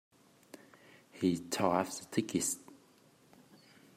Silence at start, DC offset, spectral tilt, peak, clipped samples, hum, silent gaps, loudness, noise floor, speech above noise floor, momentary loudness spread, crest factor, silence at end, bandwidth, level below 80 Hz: 0.55 s; under 0.1%; -4 dB/octave; -16 dBFS; under 0.1%; none; none; -34 LUFS; -65 dBFS; 31 dB; 24 LU; 22 dB; 1.25 s; 16 kHz; -76 dBFS